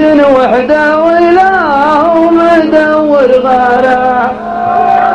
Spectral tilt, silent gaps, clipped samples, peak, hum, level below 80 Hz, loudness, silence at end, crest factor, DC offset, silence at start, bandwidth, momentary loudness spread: -6 dB/octave; none; 0.8%; 0 dBFS; none; -38 dBFS; -7 LUFS; 0 s; 6 dB; under 0.1%; 0 s; 9.8 kHz; 4 LU